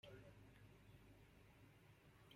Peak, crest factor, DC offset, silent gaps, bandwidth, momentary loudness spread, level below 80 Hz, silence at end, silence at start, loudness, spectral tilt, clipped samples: -50 dBFS; 16 dB; under 0.1%; none; 16 kHz; 6 LU; -76 dBFS; 0 s; 0.05 s; -67 LUFS; -5.5 dB/octave; under 0.1%